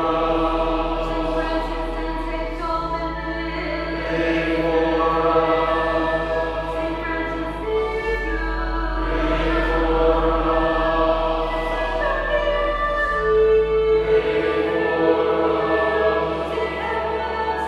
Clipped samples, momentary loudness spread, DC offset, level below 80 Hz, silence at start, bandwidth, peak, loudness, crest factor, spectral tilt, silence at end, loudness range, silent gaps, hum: under 0.1%; 7 LU; under 0.1%; -30 dBFS; 0 s; 10.5 kHz; -4 dBFS; -21 LUFS; 16 dB; -6.5 dB/octave; 0 s; 5 LU; none; none